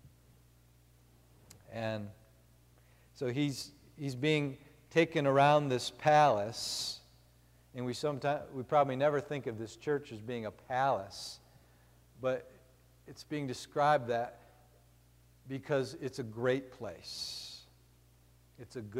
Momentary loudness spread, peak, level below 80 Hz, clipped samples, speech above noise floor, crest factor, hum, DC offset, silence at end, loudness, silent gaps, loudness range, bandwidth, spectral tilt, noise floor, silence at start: 18 LU; -14 dBFS; -68 dBFS; under 0.1%; 31 dB; 20 dB; 60 Hz at -65 dBFS; under 0.1%; 0 s; -34 LUFS; none; 9 LU; 16 kHz; -5 dB/octave; -64 dBFS; 0.05 s